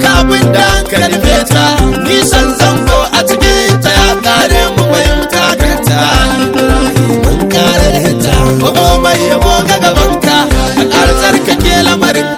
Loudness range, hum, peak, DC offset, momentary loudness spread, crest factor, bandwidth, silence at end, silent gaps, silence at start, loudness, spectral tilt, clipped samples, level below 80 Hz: 1 LU; none; 0 dBFS; under 0.1%; 2 LU; 8 dB; 19.5 kHz; 0 s; none; 0 s; -8 LUFS; -4 dB/octave; 2%; -16 dBFS